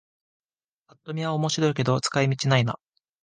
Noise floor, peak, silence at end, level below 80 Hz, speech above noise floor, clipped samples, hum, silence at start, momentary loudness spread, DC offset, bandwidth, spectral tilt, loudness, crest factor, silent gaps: -71 dBFS; -6 dBFS; 0.5 s; -62 dBFS; 48 dB; under 0.1%; none; 1.05 s; 9 LU; under 0.1%; 9.8 kHz; -5 dB/octave; -24 LUFS; 20 dB; none